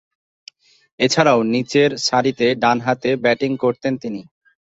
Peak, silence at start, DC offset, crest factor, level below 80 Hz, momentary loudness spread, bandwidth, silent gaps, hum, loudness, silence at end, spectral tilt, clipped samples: -2 dBFS; 1 s; under 0.1%; 18 dB; -60 dBFS; 9 LU; 8 kHz; none; none; -18 LUFS; 0.45 s; -4.5 dB/octave; under 0.1%